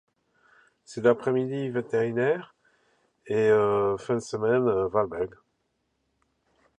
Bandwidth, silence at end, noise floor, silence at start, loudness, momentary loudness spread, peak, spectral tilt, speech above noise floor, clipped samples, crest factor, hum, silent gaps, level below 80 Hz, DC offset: 10 kHz; 1.55 s; -75 dBFS; 0.9 s; -26 LUFS; 9 LU; -6 dBFS; -7 dB/octave; 50 dB; under 0.1%; 22 dB; none; none; -62 dBFS; under 0.1%